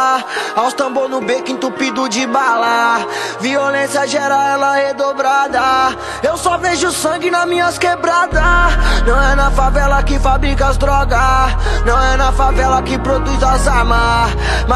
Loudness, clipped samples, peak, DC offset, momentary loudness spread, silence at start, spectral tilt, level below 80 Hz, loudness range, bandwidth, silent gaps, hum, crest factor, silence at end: -14 LUFS; under 0.1%; 0 dBFS; under 0.1%; 5 LU; 0 s; -4.5 dB/octave; -18 dBFS; 2 LU; 12.5 kHz; none; none; 12 dB; 0 s